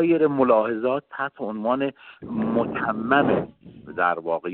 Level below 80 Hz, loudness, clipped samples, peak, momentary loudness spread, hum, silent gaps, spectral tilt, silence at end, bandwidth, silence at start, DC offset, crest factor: -60 dBFS; -23 LUFS; under 0.1%; -4 dBFS; 11 LU; none; none; -11 dB/octave; 0 s; 4.3 kHz; 0 s; under 0.1%; 18 dB